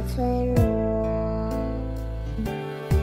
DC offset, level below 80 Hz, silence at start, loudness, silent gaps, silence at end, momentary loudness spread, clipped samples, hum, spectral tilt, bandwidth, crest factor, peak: under 0.1%; -30 dBFS; 0 s; -26 LUFS; none; 0 s; 10 LU; under 0.1%; none; -8 dB/octave; 16 kHz; 16 dB; -8 dBFS